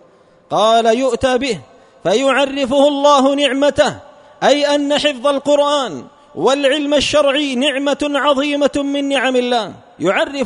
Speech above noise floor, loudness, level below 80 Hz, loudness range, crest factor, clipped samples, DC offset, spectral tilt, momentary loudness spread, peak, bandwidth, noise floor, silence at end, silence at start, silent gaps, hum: 34 dB; -15 LUFS; -48 dBFS; 2 LU; 16 dB; under 0.1%; under 0.1%; -3.5 dB/octave; 8 LU; 0 dBFS; 11 kHz; -49 dBFS; 0 s; 0.5 s; none; none